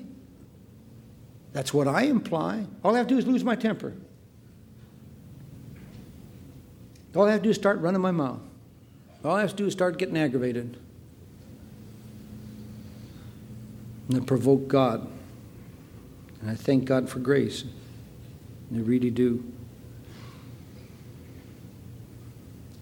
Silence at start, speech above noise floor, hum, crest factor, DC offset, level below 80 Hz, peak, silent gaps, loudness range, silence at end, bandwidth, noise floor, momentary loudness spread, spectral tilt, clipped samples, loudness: 0 s; 27 dB; none; 22 dB; under 0.1%; -58 dBFS; -8 dBFS; none; 12 LU; 0 s; 19 kHz; -51 dBFS; 24 LU; -6.5 dB/octave; under 0.1%; -26 LUFS